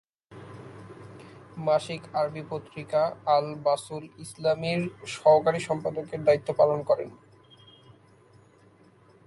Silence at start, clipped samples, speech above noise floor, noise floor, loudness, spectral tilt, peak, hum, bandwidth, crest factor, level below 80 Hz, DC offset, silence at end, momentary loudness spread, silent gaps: 0.3 s; under 0.1%; 31 dB; -57 dBFS; -26 LUFS; -5.5 dB/octave; -8 dBFS; none; 11.5 kHz; 20 dB; -66 dBFS; under 0.1%; 2.1 s; 23 LU; none